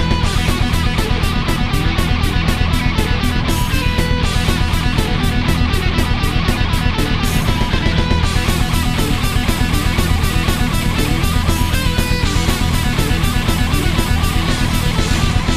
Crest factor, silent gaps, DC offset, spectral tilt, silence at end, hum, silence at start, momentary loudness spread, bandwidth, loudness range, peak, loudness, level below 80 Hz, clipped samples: 14 dB; none; 0.1%; -5 dB/octave; 0 s; none; 0 s; 1 LU; 15.5 kHz; 0 LU; -2 dBFS; -17 LUFS; -18 dBFS; under 0.1%